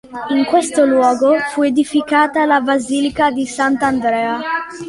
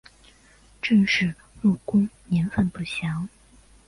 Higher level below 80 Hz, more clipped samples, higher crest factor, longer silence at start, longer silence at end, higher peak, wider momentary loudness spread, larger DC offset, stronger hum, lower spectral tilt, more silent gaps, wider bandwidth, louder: about the same, -52 dBFS vs -50 dBFS; neither; about the same, 14 dB vs 16 dB; second, 0.1 s vs 0.85 s; second, 0 s vs 0.6 s; first, -2 dBFS vs -10 dBFS; second, 6 LU vs 11 LU; neither; neither; second, -3.5 dB/octave vs -6 dB/octave; neither; about the same, 11.5 kHz vs 11.5 kHz; first, -15 LUFS vs -24 LUFS